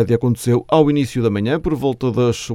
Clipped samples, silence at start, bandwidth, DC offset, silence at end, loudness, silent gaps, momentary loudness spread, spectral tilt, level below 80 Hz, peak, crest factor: under 0.1%; 0 s; 15 kHz; under 0.1%; 0 s; -17 LUFS; none; 5 LU; -7 dB/octave; -42 dBFS; 0 dBFS; 16 dB